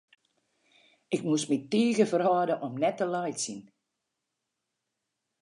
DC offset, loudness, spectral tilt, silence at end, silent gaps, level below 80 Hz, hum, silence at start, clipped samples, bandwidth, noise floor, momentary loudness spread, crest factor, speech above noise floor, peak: under 0.1%; -28 LUFS; -5 dB/octave; 1.8 s; none; -82 dBFS; none; 1.1 s; under 0.1%; 11 kHz; -84 dBFS; 10 LU; 20 dB; 57 dB; -12 dBFS